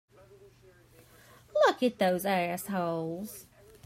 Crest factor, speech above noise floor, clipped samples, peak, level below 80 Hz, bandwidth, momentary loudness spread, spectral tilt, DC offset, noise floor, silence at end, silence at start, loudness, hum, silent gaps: 20 dB; 28 dB; under 0.1%; -12 dBFS; -68 dBFS; 16 kHz; 14 LU; -5 dB/octave; under 0.1%; -59 dBFS; 0.45 s; 1.55 s; -29 LUFS; none; none